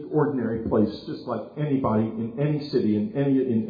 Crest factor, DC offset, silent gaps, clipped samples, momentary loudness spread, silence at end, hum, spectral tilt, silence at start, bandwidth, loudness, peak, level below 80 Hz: 14 dB; under 0.1%; none; under 0.1%; 8 LU; 0 s; none; -10.5 dB/octave; 0 s; 5 kHz; -25 LUFS; -10 dBFS; -54 dBFS